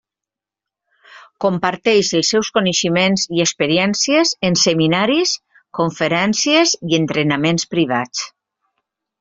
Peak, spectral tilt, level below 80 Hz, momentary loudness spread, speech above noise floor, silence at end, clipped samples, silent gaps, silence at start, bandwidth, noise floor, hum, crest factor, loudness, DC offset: -2 dBFS; -3.5 dB/octave; -58 dBFS; 8 LU; 70 dB; 0.9 s; under 0.1%; none; 1.1 s; 7.8 kHz; -87 dBFS; none; 16 dB; -16 LUFS; under 0.1%